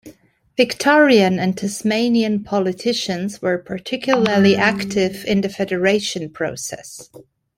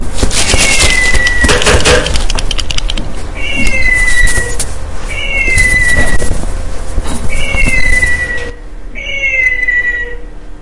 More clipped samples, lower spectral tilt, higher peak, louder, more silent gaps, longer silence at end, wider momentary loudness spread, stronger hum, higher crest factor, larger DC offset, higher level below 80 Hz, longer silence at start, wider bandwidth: second, under 0.1% vs 0.2%; first, -5 dB/octave vs -2.5 dB/octave; about the same, -2 dBFS vs 0 dBFS; second, -18 LUFS vs -11 LUFS; neither; first, 0.35 s vs 0.05 s; about the same, 12 LU vs 14 LU; neither; first, 16 dB vs 8 dB; neither; second, -56 dBFS vs -16 dBFS; about the same, 0.05 s vs 0 s; first, 15.5 kHz vs 11.5 kHz